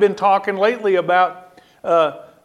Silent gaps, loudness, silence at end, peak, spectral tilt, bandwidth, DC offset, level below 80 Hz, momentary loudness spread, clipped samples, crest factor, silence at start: none; -17 LUFS; 0.25 s; -2 dBFS; -5.5 dB/octave; 11 kHz; under 0.1%; -70 dBFS; 6 LU; under 0.1%; 16 dB; 0 s